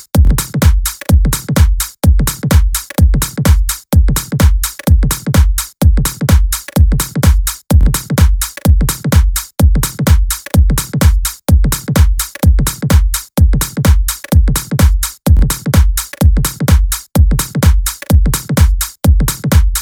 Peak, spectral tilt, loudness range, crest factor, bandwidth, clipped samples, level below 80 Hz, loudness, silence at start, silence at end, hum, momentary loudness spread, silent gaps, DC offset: 0 dBFS; -5 dB/octave; 0 LU; 10 dB; 18 kHz; 0.1%; -12 dBFS; -13 LUFS; 0.15 s; 0 s; none; 2 LU; none; under 0.1%